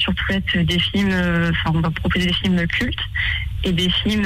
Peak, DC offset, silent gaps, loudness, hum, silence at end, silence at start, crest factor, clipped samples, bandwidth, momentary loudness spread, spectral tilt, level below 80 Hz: -8 dBFS; under 0.1%; none; -19 LUFS; none; 0 s; 0 s; 12 dB; under 0.1%; 15 kHz; 4 LU; -5.5 dB/octave; -30 dBFS